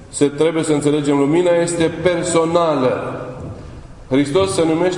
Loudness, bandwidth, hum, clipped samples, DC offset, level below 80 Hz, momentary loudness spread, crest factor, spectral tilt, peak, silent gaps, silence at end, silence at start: -16 LUFS; 11 kHz; none; under 0.1%; under 0.1%; -44 dBFS; 15 LU; 16 dB; -5.5 dB/octave; 0 dBFS; none; 0 s; 0 s